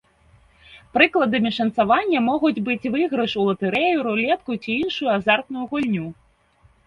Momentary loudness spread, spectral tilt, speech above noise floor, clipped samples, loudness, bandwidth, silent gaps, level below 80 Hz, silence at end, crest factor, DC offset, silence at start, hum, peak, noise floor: 7 LU; -6.5 dB/octave; 37 dB; under 0.1%; -21 LUFS; 9 kHz; none; -58 dBFS; 0.75 s; 22 dB; under 0.1%; 0.7 s; none; 0 dBFS; -58 dBFS